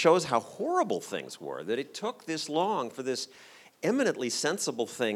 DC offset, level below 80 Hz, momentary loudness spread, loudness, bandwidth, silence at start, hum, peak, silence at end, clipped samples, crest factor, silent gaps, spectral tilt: under 0.1%; -80 dBFS; 9 LU; -31 LUFS; 16 kHz; 0 s; none; -8 dBFS; 0 s; under 0.1%; 22 dB; none; -3.5 dB/octave